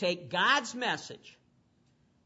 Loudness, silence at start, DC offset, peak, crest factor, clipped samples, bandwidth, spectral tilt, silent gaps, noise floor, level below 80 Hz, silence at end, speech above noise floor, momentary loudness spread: -29 LUFS; 0 s; under 0.1%; -14 dBFS; 20 dB; under 0.1%; 8 kHz; -2.5 dB/octave; none; -68 dBFS; -80 dBFS; 0.95 s; 37 dB; 19 LU